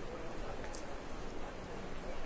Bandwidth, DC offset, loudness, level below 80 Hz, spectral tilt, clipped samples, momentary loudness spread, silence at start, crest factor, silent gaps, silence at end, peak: 8 kHz; under 0.1%; -46 LUFS; -50 dBFS; -5 dB/octave; under 0.1%; 2 LU; 0 s; 12 dB; none; 0 s; -28 dBFS